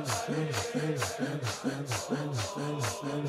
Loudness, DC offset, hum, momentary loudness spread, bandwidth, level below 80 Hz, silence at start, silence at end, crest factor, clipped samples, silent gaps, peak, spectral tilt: -33 LUFS; under 0.1%; none; 2 LU; 16 kHz; -64 dBFS; 0 s; 0 s; 16 dB; under 0.1%; none; -18 dBFS; -4.5 dB/octave